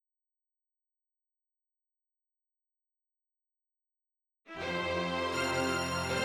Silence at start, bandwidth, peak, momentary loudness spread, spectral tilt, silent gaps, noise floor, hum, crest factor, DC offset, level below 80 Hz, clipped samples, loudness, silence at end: 4.45 s; 19 kHz; -18 dBFS; 7 LU; -4 dB/octave; none; under -90 dBFS; 60 Hz at -85 dBFS; 20 dB; under 0.1%; -64 dBFS; under 0.1%; -33 LUFS; 0 s